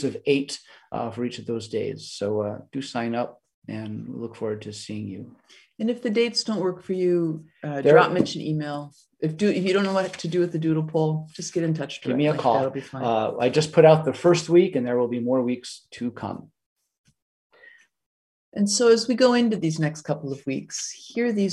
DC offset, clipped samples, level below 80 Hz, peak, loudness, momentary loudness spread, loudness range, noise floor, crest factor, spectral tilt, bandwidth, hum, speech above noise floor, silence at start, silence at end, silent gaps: under 0.1%; under 0.1%; -68 dBFS; -2 dBFS; -24 LUFS; 16 LU; 10 LU; -54 dBFS; 22 dB; -5.5 dB/octave; 12 kHz; none; 30 dB; 0 s; 0 s; 3.54-3.62 s, 16.66-16.76 s, 16.98-17.04 s, 17.22-17.50 s, 18.06-18.52 s